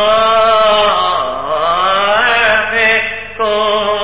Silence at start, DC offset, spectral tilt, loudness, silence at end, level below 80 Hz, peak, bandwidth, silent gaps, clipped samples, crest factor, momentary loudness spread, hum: 0 s; 1%; -6 dB/octave; -11 LUFS; 0 s; -42 dBFS; -2 dBFS; 4 kHz; none; under 0.1%; 10 dB; 7 LU; none